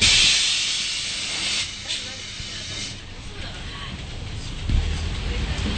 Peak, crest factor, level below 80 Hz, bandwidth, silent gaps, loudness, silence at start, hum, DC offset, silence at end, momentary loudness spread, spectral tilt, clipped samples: -4 dBFS; 20 dB; -32 dBFS; 9.2 kHz; none; -23 LUFS; 0 s; none; under 0.1%; 0 s; 17 LU; -1.5 dB/octave; under 0.1%